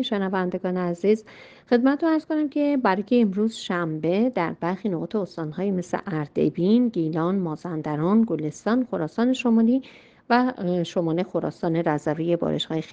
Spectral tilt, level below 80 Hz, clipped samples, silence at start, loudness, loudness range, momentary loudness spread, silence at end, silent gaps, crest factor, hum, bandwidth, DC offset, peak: -7 dB/octave; -64 dBFS; under 0.1%; 0 s; -24 LUFS; 2 LU; 7 LU; 0 s; none; 18 dB; none; 9 kHz; under 0.1%; -6 dBFS